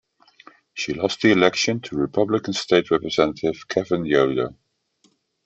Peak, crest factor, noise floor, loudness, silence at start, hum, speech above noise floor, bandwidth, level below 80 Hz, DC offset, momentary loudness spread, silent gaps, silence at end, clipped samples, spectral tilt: -2 dBFS; 20 dB; -64 dBFS; -21 LUFS; 0.75 s; none; 43 dB; 8.2 kHz; -56 dBFS; under 0.1%; 9 LU; none; 0.95 s; under 0.1%; -4.5 dB/octave